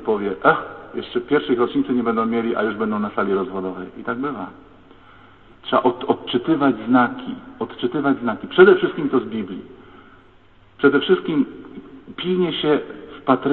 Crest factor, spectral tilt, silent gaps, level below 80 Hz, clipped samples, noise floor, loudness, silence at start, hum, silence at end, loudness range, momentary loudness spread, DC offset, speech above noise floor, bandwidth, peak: 20 dB; -9.5 dB/octave; none; -56 dBFS; under 0.1%; -52 dBFS; -20 LUFS; 0 s; none; 0 s; 6 LU; 14 LU; 0.2%; 32 dB; 4.3 kHz; 0 dBFS